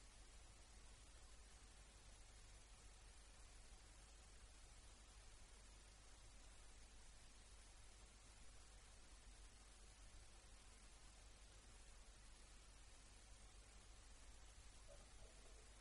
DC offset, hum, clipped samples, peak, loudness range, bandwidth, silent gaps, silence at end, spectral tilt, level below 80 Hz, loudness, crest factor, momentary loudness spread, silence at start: under 0.1%; 50 Hz at -70 dBFS; under 0.1%; -50 dBFS; 0 LU; 11.5 kHz; none; 0 s; -2.5 dB/octave; -66 dBFS; -66 LUFS; 14 dB; 1 LU; 0 s